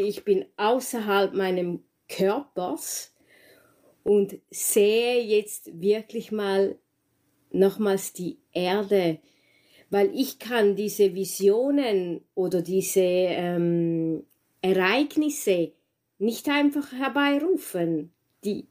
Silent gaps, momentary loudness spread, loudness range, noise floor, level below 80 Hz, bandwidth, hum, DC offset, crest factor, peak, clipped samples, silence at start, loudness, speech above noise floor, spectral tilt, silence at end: none; 10 LU; 3 LU; -71 dBFS; -72 dBFS; 16 kHz; none; under 0.1%; 18 dB; -8 dBFS; under 0.1%; 0 s; -25 LUFS; 47 dB; -4.5 dB/octave; 0.1 s